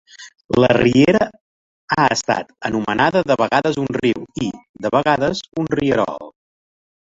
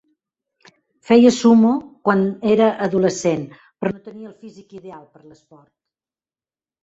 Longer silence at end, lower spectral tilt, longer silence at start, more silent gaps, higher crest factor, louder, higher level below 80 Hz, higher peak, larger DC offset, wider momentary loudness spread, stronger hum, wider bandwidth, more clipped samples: second, 0.9 s vs 1.85 s; about the same, -5.5 dB/octave vs -6 dB/octave; second, 0.2 s vs 1.1 s; first, 0.45-0.49 s, 1.41-1.88 s, 4.69-4.74 s vs none; about the same, 16 dB vs 18 dB; about the same, -18 LUFS vs -17 LUFS; first, -48 dBFS vs -60 dBFS; about the same, -2 dBFS vs -2 dBFS; neither; second, 11 LU vs 25 LU; neither; about the same, 7.8 kHz vs 8 kHz; neither